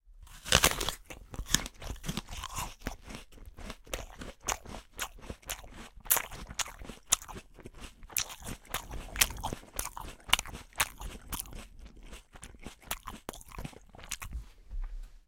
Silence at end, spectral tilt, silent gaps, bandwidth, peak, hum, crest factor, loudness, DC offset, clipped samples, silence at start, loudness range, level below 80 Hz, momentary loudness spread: 0.1 s; -1.5 dB/octave; none; 17 kHz; -2 dBFS; none; 36 dB; -33 LUFS; under 0.1%; under 0.1%; 0.05 s; 10 LU; -46 dBFS; 21 LU